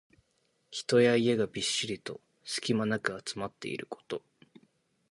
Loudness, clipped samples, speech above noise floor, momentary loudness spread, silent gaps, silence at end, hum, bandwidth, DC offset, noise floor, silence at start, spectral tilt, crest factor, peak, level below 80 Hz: -31 LUFS; under 0.1%; 44 dB; 16 LU; none; 0.9 s; none; 11.5 kHz; under 0.1%; -74 dBFS; 0.7 s; -4 dB/octave; 20 dB; -12 dBFS; -70 dBFS